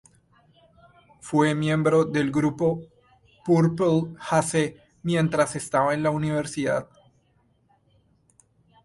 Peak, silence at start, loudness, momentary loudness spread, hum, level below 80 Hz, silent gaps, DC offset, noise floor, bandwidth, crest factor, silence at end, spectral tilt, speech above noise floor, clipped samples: -8 dBFS; 1.25 s; -24 LUFS; 7 LU; none; -60 dBFS; none; under 0.1%; -65 dBFS; 11.5 kHz; 18 dB; 2 s; -6 dB/octave; 42 dB; under 0.1%